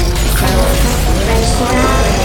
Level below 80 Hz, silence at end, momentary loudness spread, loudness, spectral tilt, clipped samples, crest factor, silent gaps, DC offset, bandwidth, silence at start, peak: -14 dBFS; 0 s; 2 LU; -13 LUFS; -4.5 dB/octave; under 0.1%; 12 dB; none; under 0.1%; 18.5 kHz; 0 s; 0 dBFS